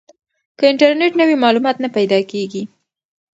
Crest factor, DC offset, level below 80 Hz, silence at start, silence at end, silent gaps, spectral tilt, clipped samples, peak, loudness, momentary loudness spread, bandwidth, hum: 16 dB; under 0.1%; -68 dBFS; 0.6 s; 0.7 s; none; -5.5 dB/octave; under 0.1%; 0 dBFS; -15 LUFS; 12 LU; 8 kHz; none